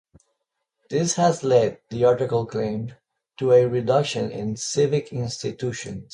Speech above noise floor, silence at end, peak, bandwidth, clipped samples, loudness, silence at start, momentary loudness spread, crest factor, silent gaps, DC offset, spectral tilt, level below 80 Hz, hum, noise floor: 56 dB; 0.1 s; -6 dBFS; 11 kHz; under 0.1%; -23 LUFS; 0.9 s; 11 LU; 18 dB; none; under 0.1%; -5.5 dB/octave; -58 dBFS; none; -78 dBFS